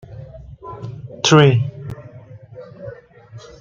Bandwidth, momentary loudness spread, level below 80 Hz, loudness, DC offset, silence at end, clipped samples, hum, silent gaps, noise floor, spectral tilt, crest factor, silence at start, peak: 7.6 kHz; 27 LU; -50 dBFS; -14 LUFS; under 0.1%; 0.2 s; under 0.1%; none; none; -41 dBFS; -5.5 dB/octave; 20 dB; 0.1 s; 0 dBFS